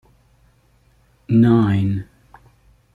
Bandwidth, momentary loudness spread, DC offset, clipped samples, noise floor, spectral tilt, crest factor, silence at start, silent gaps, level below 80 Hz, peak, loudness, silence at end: 4.5 kHz; 10 LU; under 0.1%; under 0.1%; -57 dBFS; -10 dB/octave; 16 dB; 1.3 s; none; -52 dBFS; -4 dBFS; -17 LUFS; 0.9 s